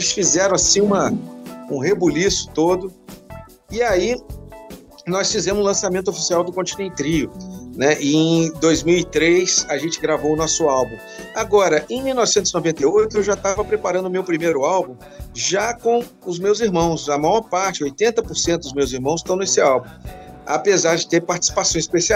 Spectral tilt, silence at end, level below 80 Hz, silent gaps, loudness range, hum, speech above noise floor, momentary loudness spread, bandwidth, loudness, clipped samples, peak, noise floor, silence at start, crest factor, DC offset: -3.5 dB/octave; 0 s; -44 dBFS; none; 3 LU; none; 21 dB; 13 LU; 16 kHz; -18 LUFS; under 0.1%; -2 dBFS; -39 dBFS; 0 s; 18 dB; under 0.1%